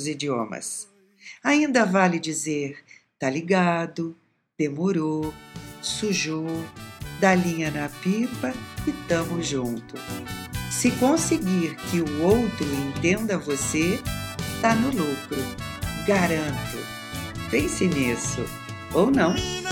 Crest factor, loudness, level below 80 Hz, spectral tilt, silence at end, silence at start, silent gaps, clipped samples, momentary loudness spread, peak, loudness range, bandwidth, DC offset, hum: 22 dB; -25 LUFS; -46 dBFS; -4.5 dB/octave; 0 s; 0 s; none; under 0.1%; 13 LU; -4 dBFS; 3 LU; 17.5 kHz; under 0.1%; none